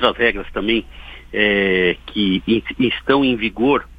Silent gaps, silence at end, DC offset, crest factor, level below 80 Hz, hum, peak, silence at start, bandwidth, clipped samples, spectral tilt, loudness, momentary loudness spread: none; 0.05 s; under 0.1%; 18 dB; -40 dBFS; none; 0 dBFS; 0 s; 5 kHz; under 0.1%; -7 dB/octave; -18 LUFS; 7 LU